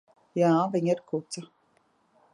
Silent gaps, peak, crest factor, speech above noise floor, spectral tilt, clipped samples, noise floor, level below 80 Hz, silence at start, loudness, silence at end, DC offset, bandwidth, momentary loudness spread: none; -12 dBFS; 18 dB; 42 dB; -6.5 dB/octave; under 0.1%; -68 dBFS; -78 dBFS; 0.35 s; -27 LUFS; 0.9 s; under 0.1%; 10.5 kHz; 15 LU